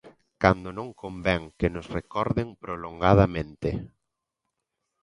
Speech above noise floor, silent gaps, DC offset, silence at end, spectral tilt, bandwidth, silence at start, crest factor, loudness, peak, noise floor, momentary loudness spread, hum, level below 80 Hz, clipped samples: 57 dB; none; under 0.1%; 1.15 s; -8 dB/octave; 10 kHz; 0.05 s; 26 dB; -26 LUFS; -2 dBFS; -83 dBFS; 15 LU; none; -42 dBFS; under 0.1%